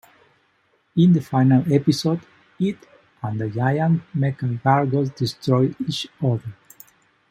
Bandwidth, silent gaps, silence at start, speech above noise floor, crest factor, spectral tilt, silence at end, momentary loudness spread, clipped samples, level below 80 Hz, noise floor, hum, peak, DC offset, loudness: 16 kHz; none; 0.95 s; 44 dB; 20 dB; -7.5 dB/octave; 0.8 s; 11 LU; under 0.1%; -62 dBFS; -64 dBFS; none; -2 dBFS; under 0.1%; -21 LUFS